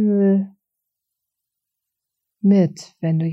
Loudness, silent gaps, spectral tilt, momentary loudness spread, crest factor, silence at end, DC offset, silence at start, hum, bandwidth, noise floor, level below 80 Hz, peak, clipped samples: -19 LUFS; none; -9 dB/octave; 10 LU; 14 dB; 0 s; under 0.1%; 0 s; none; 8 kHz; -82 dBFS; -74 dBFS; -6 dBFS; under 0.1%